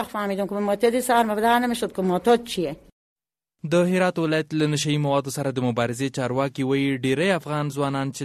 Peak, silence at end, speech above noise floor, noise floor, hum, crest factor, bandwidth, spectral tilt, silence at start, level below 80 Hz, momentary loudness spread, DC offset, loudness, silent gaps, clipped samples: -8 dBFS; 0 s; 38 dB; -60 dBFS; none; 16 dB; 13.5 kHz; -5.5 dB/octave; 0 s; -58 dBFS; 7 LU; under 0.1%; -23 LUFS; 2.92-3.16 s; under 0.1%